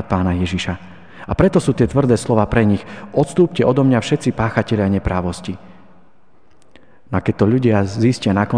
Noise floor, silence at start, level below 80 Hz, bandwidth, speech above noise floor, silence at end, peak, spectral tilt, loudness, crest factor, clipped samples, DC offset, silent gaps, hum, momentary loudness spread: -56 dBFS; 0 s; -38 dBFS; 10 kHz; 40 dB; 0 s; 0 dBFS; -7 dB/octave; -17 LUFS; 18 dB; under 0.1%; 0.8%; none; none; 10 LU